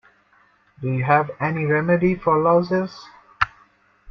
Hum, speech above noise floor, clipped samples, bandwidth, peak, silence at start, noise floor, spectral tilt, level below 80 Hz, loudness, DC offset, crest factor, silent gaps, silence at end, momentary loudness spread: none; 39 dB; under 0.1%; 6.4 kHz; -2 dBFS; 0.8 s; -58 dBFS; -8.5 dB/octave; -52 dBFS; -21 LUFS; under 0.1%; 20 dB; none; 0 s; 10 LU